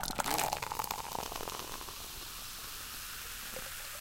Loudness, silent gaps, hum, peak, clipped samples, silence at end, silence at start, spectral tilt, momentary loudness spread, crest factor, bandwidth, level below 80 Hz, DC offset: -38 LUFS; none; none; -12 dBFS; under 0.1%; 0 s; 0 s; -1.5 dB/octave; 9 LU; 28 dB; 17 kHz; -54 dBFS; under 0.1%